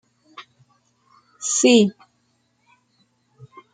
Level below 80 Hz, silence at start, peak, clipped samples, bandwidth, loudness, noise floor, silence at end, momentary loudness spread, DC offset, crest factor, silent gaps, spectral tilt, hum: -68 dBFS; 0.4 s; -4 dBFS; under 0.1%; 9.6 kHz; -17 LUFS; -67 dBFS; 1.85 s; 29 LU; under 0.1%; 20 dB; none; -3 dB/octave; none